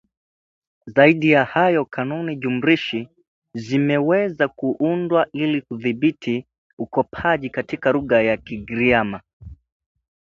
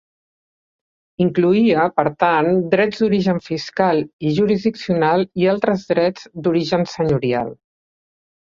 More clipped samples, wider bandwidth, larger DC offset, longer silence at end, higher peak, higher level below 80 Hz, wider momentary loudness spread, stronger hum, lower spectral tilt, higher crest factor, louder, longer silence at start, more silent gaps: neither; about the same, 7.4 kHz vs 7.4 kHz; neither; second, 0.7 s vs 0.95 s; about the same, 0 dBFS vs -2 dBFS; about the same, -52 dBFS vs -54 dBFS; first, 12 LU vs 6 LU; neither; about the same, -7.5 dB/octave vs -7 dB/octave; about the same, 20 dB vs 16 dB; about the same, -20 LUFS vs -18 LUFS; second, 0.85 s vs 1.2 s; first, 3.28-3.42 s, 6.58-6.77 s, 9.33-9.40 s vs 4.13-4.19 s